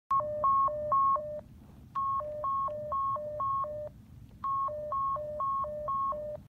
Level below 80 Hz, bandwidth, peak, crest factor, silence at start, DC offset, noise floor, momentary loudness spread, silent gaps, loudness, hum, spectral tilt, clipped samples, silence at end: -58 dBFS; 4.3 kHz; -20 dBFS; 12 dB; 0.1 s; under 0.1%; -52 dBFS; 11 LU; none; -32 LUFS; none; -8 dB/octave; under 0.1%; 0 s